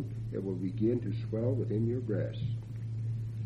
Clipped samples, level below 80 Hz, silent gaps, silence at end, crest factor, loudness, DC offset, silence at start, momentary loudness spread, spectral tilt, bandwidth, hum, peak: under 0.1%; -54 dBFS; none; 0 s; 14 dB; -34 LUFS; under 0.1%; 0 s; 6 LU; -10 dB/octave; 5 kHz; none; -20 dBFS